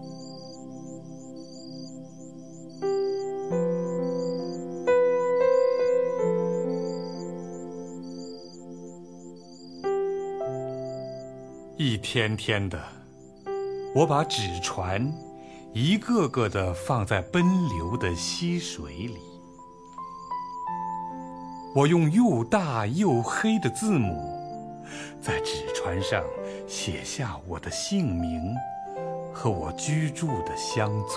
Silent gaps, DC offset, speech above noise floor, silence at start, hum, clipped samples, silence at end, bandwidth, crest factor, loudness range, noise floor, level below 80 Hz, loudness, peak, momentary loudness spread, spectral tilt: none; under 0.1%; 23 dB; 0 s; none; under 0.1%; 0 s; 11 kHz; 20 dB; 9 LU; -48 dBFS; -52 dBFS; -27 LUFS; -8 dBFS; 19 LU; -5.5 dB/octave